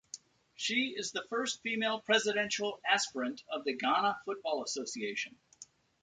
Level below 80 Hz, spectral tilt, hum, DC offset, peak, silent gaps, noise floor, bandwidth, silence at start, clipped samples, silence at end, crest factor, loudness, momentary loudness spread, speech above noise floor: -80 dBFS; -1.5 dB/octave; none; under 0.1%; -16 dBFS; none; -58 dBFS; 9.6 kHz; 0.15 s; under 0.1%; 0.4 s; 20 dB; -33 LUFS; 9 LU; 24 dB